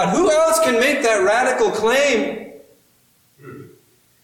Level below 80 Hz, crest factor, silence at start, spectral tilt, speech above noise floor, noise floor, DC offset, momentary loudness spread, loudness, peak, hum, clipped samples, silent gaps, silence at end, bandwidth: -54 dBFS; 12 dB; 0 s; -3 dB/octave; 41 dB; -58 dBFS; under 0.1%; 5 LU; -16 LUFS; -6 dBFS; none; under 0.1%; none; 0.6 s; 18.5 kHz